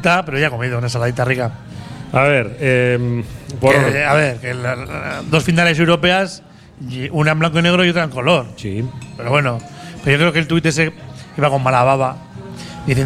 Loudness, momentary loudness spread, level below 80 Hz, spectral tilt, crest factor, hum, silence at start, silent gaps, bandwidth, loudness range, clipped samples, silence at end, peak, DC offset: -16 LUFS; 16 LU; -44 dBFS; -5.5 dB/octave; 16 dB; none; 0 s; none; 13.5 kHz; 2 LU; under 0.1%; 0 s; 0 dBFS; under 0.1%